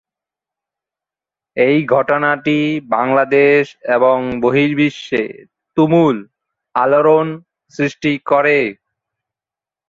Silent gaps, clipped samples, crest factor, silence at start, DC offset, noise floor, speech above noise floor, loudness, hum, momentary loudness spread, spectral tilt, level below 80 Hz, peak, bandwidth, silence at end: none; under 0.1%; 14 dB; 1.55 s; under 0.1%; -89 dBFS; 75 dB; -15 LUFS; none; 11 LU; -7 dB/octave; -56 dBFS; -2 dBFS; 7.4 kHz; 1.15 s